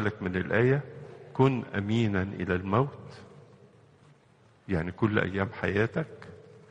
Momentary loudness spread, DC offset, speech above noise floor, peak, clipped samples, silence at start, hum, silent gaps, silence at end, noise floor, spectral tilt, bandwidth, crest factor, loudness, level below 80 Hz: 20 LU; under 0.1%; 33 dB; -8 dBFS; under 0.1%; 0 s; none; none; 0.15 s; -61 dBFS; -8 dB/octave; 8.4 kHz; 22 dB; -29 LUFS; -56 dBFS